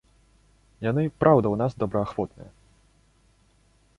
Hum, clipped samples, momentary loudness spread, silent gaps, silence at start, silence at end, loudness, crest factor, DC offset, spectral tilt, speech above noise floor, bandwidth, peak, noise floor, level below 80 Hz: 50 Hz at -50 dBFS; under 0.1%; 12 LU; none; 0.8 s; 1.5 s; -24 LUFS; 24 dB; under 0.1%; -9.5 dB/octave; 38 dB; 11 kHz; -4 dBFS; -62 dBFS; -54 dBFS